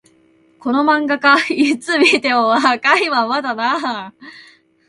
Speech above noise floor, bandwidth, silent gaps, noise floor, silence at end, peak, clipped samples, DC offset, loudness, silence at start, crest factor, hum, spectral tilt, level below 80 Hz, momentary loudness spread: 38 dB; 11.5 kHz; none; -53 dBFS; 0.45 s; 0 dBFS; under 0.1%; under 0.1%; -15 LUFS; 0.65 s; 16 dB; none; -3 dB/octave; -66 dBFS; 9 LU